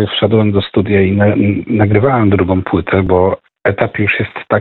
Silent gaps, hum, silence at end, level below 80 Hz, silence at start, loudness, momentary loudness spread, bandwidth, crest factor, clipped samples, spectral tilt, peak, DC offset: none; none; 0 s; -38 dBFS; 0 s; -13 LUFS; 5 LU; 4.3 kHz; 12 dB; under 0.1%; -11 dB/octave; 0 dBFS; under 0.1%